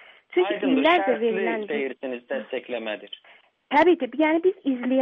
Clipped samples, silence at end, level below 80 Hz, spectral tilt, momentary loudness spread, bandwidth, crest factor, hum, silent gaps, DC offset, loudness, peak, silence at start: under 0.1%; 0 s; -68 dBFS; -6.5 dB/octave; 13 LU; 5.6 kHz; 16 dB; none; none; under 0.1%; -23 LUFS; -8 dBFS; 0.3 s